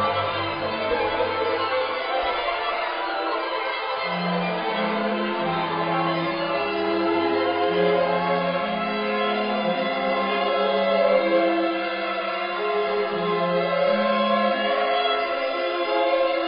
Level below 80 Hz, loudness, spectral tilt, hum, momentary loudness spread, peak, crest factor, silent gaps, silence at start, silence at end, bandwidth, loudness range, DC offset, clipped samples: -58 dBFS; -23 LUFS; -9.5 dB/octave; none; 5 LU; -8 dBFS; 16 dB; none; 0 s; 0 s; 5.4 kHz; 3 LU; under 0.1%; under 0.1%